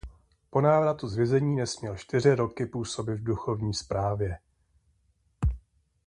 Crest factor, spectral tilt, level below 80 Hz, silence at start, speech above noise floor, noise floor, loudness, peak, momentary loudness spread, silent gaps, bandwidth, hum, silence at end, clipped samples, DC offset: 20 dB; -6.5 dB/octave; -42 dBFS; 0.05 s; 42 dB; -69 dBFS; -28 LUFS; -8 dBFS; 9 LU; none; 10.5 kHz; none; 0.5 s; under 0.1%; under 0.1%